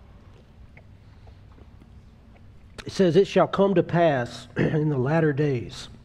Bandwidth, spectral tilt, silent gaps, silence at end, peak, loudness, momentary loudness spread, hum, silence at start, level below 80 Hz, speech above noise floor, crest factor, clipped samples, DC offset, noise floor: 10.5 kHz; -7.5 dB/octave; none; 0.1 s; -6 dBFS; -23 LUFS; 15 LU; none; 0.6 s; -52 dBFS; 27 dB; 20 dB; under 0.1%; under 0.1%; -49 dBFS